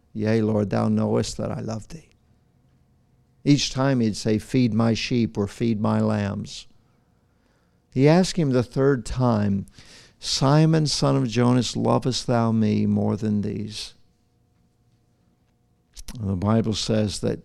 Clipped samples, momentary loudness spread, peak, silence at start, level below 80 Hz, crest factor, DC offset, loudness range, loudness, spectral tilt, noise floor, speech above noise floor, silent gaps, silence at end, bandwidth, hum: under 0.1%; 13 LU; -4 dBFS; 0.15 s; -46 dBFS; 18 dB; under 0.1%; 7 LU; -22 LUFS; -6 dB/octave; -64 dBFS; 43 dB; none; 0.05 s; 12 kHz; none